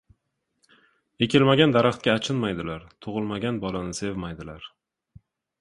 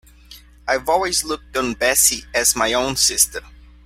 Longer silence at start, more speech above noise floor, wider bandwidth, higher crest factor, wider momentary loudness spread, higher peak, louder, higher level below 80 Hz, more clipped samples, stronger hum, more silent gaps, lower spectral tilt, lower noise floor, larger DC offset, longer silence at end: first, 1.2 s vs 0.3 s; first, 52 dB vs 25 dB; second, 11.5 kHz vs 16.5 kHz; about the same, 22 dB vs 20 dB; first, 19 LU vs 9 LU; second, -4 dBFS vs 0 dBFS; second, -24 LUFS vs -17 LUFS; second, -54 dBFS vs -42 dBFS; neither; neither; neither; first, -5.5 dB/octave vs -0.5 dB/octave; first, -76 dBFS vs -44 dBFS; neither; first, 0.95 s vs 0.35 s